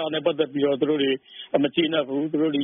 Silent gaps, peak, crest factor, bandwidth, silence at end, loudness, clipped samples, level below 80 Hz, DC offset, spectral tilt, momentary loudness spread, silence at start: none; -6 dBFS; 18 dB; 3.8 kHz; 0 s; -24 LUFS; under 0.1%; -70 dBFS; under 0.1%; -3.5 dB/octave; 4 LU; 0 s